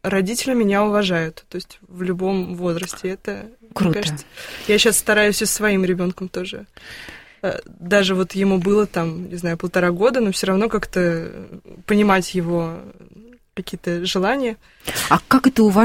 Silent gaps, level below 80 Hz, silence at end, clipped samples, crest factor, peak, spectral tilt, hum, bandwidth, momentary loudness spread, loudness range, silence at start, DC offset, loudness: none; -46 dBFS; 0 s; under 0.1%; 20 dB; 0 dBFS; -4.5 dB/octave; none; 16.5 kHz; 18 LU; 4 LU; 0.05 s; under 0.1%; -19 LUFS